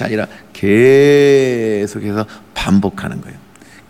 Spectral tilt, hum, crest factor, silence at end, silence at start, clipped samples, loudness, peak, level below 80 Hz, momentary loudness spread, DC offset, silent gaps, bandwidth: -6.5 dB/octave; none; 12 dB; 0.5 s; 0 s; under 0.1%; -13 LUFS; -2 dBFS; -44 dBFS; 17 LU; under 0.1%; none; 13.5 kHz